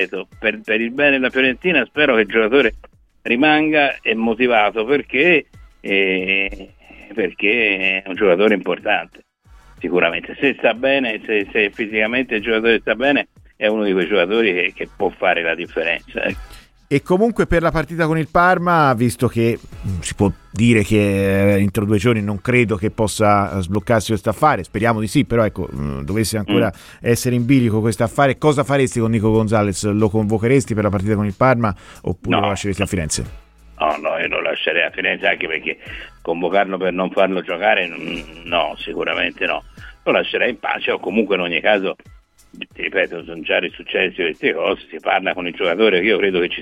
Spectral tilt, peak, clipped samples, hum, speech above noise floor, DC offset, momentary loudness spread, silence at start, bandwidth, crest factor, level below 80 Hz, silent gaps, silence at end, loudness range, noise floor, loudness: -5.5 dB/octave; -2 dBFS; under 0.1%; none; 29 dB; under 0.1%; 9 LU; 0 s; 16 kHz; 16 dB; -42 dBFS; none; 0 s; 4 LU; -47 dBFS; -18 LUFS